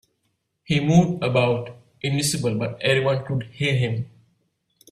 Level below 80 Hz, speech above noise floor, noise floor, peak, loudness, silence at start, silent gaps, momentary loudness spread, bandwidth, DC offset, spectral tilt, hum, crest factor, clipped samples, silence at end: -56 dBFS; 52 dB; -73 dBFS; -4 dBFS; -22 LUFS; 0.7 s; none; 11 LU; 14.5 kHz; under 0.1%; -5.5 dB/octave; none; 18 dB; under 0.1%; 0.85 s